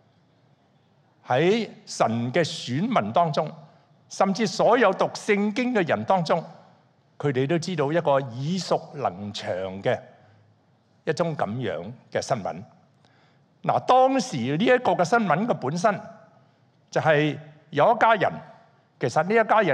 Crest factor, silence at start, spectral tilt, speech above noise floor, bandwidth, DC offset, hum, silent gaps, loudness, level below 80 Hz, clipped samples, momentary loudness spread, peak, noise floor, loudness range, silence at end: 20 dB; 1.25 s; -5.5 dB/octave; 39 dB; 11.5 kHz; under 0.1%; none; none; -24 LUFS; -72 dBFS; under 0.1%; 12 LU; -4 dBFS; -62 dBFS; 7 LU; 0 s